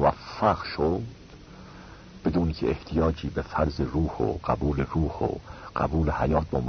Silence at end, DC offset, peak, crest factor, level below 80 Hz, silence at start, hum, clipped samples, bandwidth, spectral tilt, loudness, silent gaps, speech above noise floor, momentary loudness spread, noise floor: 0 s; under 0.1%; -8 dBFS; 18 dB; -38 dBFS; 0 s; none; under 0.1%; 6.6 kHz; -8 dB/octave; -27 LUFS; none; 20 dB; 20 LU; -46 dBFS